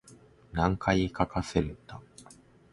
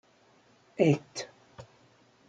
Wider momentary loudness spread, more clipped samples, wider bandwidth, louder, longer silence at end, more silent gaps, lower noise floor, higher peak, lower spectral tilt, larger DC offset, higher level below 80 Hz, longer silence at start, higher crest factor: second, 20 LU vs 26 LU; neither; first, 11.5 kHz vs 9.2 kHz; about the same, -30 LUFS vs -29 LUFS; second, 0.4 s vs 0.65 s; neither; second, -56 dBFS vs -63 dBFS; first, -8 dBFS vs -12 dBFS; about the same, -6.5 dB/octave vs -6.5 dB/octave; neither; first, -44 dBFS vs -74 dBFS; second, 0.05 s vs 0.8 s; about the same, 22 dB vs 22 dB